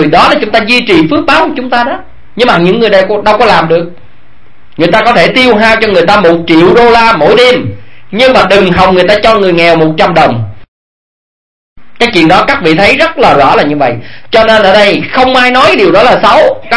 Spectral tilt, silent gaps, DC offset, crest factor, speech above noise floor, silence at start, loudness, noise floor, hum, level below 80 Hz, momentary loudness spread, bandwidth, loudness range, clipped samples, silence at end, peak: -5.5 dB/octave; 10.68-11.76 s; 6%; 6 dB; 38 dB; 0 s; -5 LUFS; -43 dBFS; none; -34 dBFS; 7 LU; 11 kHz; 4 LU; 5%; 0 s; 0 dBFS